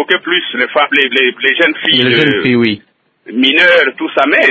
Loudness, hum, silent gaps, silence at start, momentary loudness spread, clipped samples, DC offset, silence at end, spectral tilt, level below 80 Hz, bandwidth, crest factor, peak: -10 LUFS; none; none; 0 s; 6 LU; 0.2%; under 0.1%; 0 s; -5.5 dB/octave; -56 dBFS; 8 kHz; 12 dB; 0 dBFS